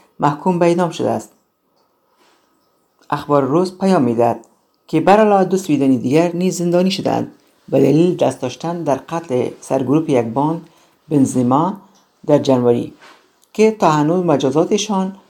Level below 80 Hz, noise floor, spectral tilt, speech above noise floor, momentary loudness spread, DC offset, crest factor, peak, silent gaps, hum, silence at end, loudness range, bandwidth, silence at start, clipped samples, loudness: -60 dBFS; -62 dBFS; -6.5 dB/octave; 47 dB; 9 LU; under 0.1%; 16 dB; 0 dBFS; none; none; 0.15 s; 5 LU; 18 kHz; 0.2 s; under 0.1%; -16 LUFS